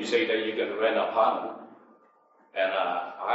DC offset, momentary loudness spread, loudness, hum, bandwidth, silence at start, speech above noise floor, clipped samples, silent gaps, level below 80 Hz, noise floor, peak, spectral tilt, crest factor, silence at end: under 0.1%; 11 LU; -27 LUFS; none; 8 kHz; 0 s; 35 dB; under 0.1%; none; -88 dBFS; -62 dBFS; -10 dBFS; -3.5 dB/octave; 18 dB; 0 s